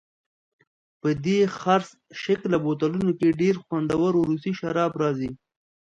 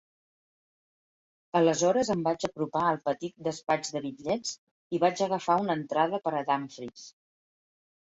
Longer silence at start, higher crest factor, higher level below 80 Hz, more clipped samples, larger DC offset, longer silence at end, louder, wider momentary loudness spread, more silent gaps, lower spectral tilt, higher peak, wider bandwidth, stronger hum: second, 1.05 s vs 1.55 s; about the same, 18 dB vs 20 dB; first, -60 dBFS vs -70 dBFS; neither; neither; second, 0.5 s vs 0.9 s; first, -24 LUFS vs -29 LUFS; second, 7 LU vs 11 LU; second, none vs 4.58-4.90 s; first, -7 dB/octave vs -4.5 dB/octave; first, -6 dBFS vs -10 dBFS; about the same, 9 kHz vs 8.2 kHz; neither